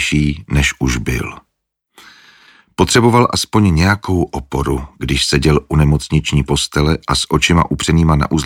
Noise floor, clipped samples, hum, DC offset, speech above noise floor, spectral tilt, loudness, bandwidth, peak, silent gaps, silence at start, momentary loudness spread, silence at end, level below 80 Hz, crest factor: -60 dBFS; under 0.1%; none; under 0.1%; 46 dB; -5 dB/octave; -14 LUFS; 16.5 kHz; 0 dBFS; none; 0 s; 8 LU; 0 s; -26 dBFS; 14 dB